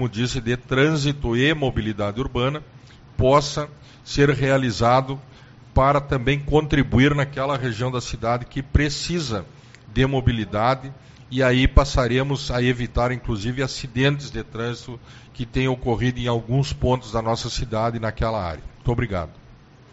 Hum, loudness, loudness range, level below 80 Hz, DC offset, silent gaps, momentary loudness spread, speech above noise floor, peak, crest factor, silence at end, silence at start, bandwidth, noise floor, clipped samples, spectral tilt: none; -22 LUFS; 4 LU; -32 dBFS; under 0.1%; none; 11 LU; 26 dB; 0 dBFS; 22 dB; 0.4 s; 0 s; 8 kHz; -48 dBFS; under 0.1%; -5 dB/octave